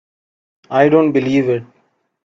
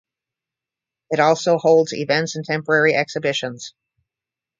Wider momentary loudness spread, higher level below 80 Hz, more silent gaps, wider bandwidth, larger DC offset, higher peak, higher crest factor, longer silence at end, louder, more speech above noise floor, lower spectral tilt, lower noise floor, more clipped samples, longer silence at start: about the same, 9 LU vs 11 LU; first, -58 dBFS vs -68 dBFS; neither; about the same, 7.4 kHz vs 7.6 kHz; neither; first, 0 dBFS vs -4 dBFS; about the same, 16 dB vs 18 dB; second, 0.6 s vs 0.9 s; first, -15 LUFS vs -18 LUFS; second, 48 dB vs 69 dB; first, -8 dB/octave vs -4.5 dB/octave; second, -62 dBFS vs -88 dBFS; neither; second, 0.7 s vs 1.1 s